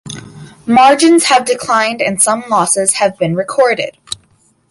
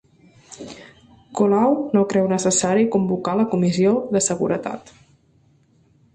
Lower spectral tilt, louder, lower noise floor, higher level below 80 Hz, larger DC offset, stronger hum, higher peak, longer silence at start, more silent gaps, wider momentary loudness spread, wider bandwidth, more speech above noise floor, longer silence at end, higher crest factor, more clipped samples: second, -3 dB/octave vs -5.5 dB/octave; first, -11 LUFS vs -19 LUFS; second, -53 dBFS vs -58 dBFS; about the same, -54 dBFS vs -58 dBFS; neither; neither; first, 0 dBFS vs -6 dBFS; second, 0.05 s vs 0.5 s; neither; about the same, 18 LU vs 18 LU; first, 13 kHz vs 11.5 kHz; about the same, 42 dB vs 39 dB; second, 0.55 s vs 1.35 s; about the same, 12 dB vs 16 dB; neither